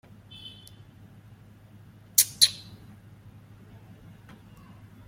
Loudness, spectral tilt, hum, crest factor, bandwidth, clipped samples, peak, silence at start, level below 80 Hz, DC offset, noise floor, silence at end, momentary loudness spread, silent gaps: -21 LUFS; 0.5 dB/octave; none; 30 dB; 16.5 kHz; under 0.1%; -2 dBFS; 0.45 s; -64 dBFS; under 0.1%; -52 dBFS; 2.5 s; 29 LU; none